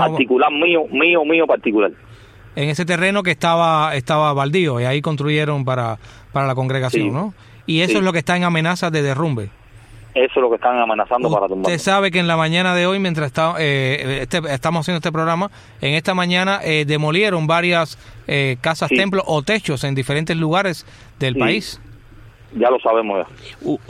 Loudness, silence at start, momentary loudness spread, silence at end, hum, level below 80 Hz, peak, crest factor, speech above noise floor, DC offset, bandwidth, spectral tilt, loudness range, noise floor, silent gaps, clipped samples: -17 LUFS; 0 s; 8 LU; 0.1 s; none; -50 dBFS; -2 dBFS; 16 dB; 25 dB; under 0.1%; 14.5 kHz; -5.5 dB/octave; 3 LU; -42 dBFS; none; under 0.1%